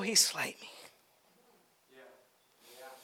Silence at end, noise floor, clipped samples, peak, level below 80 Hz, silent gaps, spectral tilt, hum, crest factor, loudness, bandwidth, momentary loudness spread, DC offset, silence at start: 0.1 s; -68 dBFS; under 0.1%; -14 dBFS; under -90 dBFS; none; 0 dB/octave; none; 24 dB; -29 LUFS; over 20 kHz; 27 LU; under 0.1%; 0 s